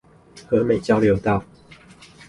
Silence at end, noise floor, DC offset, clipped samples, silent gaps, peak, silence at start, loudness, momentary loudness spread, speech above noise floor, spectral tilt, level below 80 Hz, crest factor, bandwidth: 0.85 s; -47 dBFS; under 0.1%; under 0.1%; none; -6 dBFS; 0.35 s; -20 LUFS; 6 LU; 28 dB; -7.5 dB/octave; -46 dBFS; 16 dB; 11.5 kHz